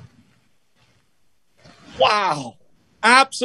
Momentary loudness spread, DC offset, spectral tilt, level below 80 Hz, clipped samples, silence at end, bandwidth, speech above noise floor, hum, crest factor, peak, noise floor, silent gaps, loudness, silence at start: 14 LU; under 0.1%; -2 dB/octave; -64 dBFS; under 0.1%; 0 s; 12.5 kHz; 50 dB; none; 22 dB; 0 dBFS; -67 dBFS; none; -17 LUFS; 1.95 s